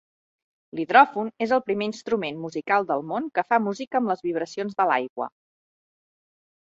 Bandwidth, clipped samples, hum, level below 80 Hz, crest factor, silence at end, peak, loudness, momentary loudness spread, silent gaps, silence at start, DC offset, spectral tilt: 7.8 kHz; under 0.1%; none; -72 dBFS; 24 dB; 1.45 s; -2 dBFS; -24 LUFS; 14 LU; 3.87-3.91 s, 5.10-5.16 s; 0.75 s; under 0.1%; -5.5 dB/octave